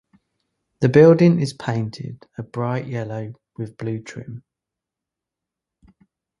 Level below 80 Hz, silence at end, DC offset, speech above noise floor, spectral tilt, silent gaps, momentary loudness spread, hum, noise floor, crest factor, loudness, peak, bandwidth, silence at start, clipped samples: -58 dBFS; 2 s; under 0.1%; 67 dB; -8 dB/octave; none; 23 LU; none; -86 dBFS; 22 dB; -19 LUFS; 0 dBFS; 11.5 kHz; 0.8 s; under 0.1%